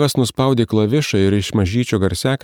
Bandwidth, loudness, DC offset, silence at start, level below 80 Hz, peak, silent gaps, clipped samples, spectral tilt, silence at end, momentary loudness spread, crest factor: 19 kHz; -17 LUFS; under 0.1%; 0 s; -42 dBFS; -2 dBFS; none; under 0.1%; -6 dB/octave; 0.05 s; 2 LU; 14 dB